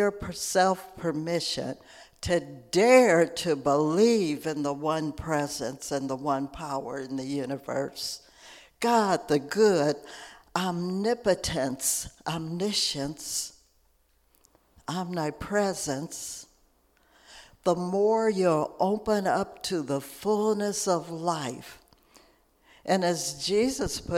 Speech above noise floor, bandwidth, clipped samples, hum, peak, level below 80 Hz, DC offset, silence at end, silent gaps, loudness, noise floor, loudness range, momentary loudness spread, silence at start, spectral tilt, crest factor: 39 dB; 16.5 kHz; under 0.1%; none; -6 dBFS; -54 dBFS; under 0.1%; 0 s; none; -27 LUFS; -66 dBFS; 8 LU; 11 LU; 0 s; -4 dB/octave; 22 dB